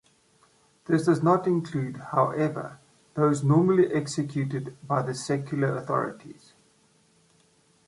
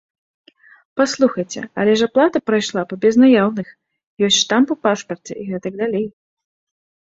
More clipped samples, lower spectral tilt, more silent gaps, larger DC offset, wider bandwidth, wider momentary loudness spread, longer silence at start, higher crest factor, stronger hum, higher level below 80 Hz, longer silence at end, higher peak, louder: neither; first, -7 dB/octave vs -4 dB/octave; second, none vs 4.07-4.17 s; neither; first, 11.5 kHz vs 7.8 kHz; about the same, 13 LU vs 15 LU; about the same, 0.9 s vs 0.95 s; about the same, 18 dB vs 16 dB; neither; second, -68 dBFS vs -62 dBFS; first, 1.55 s vs 0.95 s; second, -8 dBFS vs -2 dBFS; second, -26 LUFS vs -17 LUFS